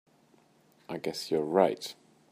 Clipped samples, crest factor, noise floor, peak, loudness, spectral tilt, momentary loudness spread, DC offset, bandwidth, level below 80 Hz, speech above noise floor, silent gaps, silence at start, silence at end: under 0.1%; 22 dB; -64 dBFS; -10 dBFS; -30 LUFS; -5 dB/octave; 15 LU; under 0.1%; 15.5 kHz; -78 dBFS; 35 dB; none; 0.9 s; 0.4 s